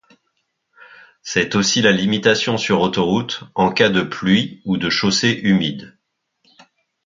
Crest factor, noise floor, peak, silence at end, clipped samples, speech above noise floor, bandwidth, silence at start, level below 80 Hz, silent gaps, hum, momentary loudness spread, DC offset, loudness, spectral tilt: 18 dB; -71 dBFS; 0 dBFS; 1.15 s; under 0.1%; 53 dB; 7.6 kHz; 1.25 s; -52 dBFS; none; none; 8 LU; under 0.1%; -17 LUFS; -4 dB/octave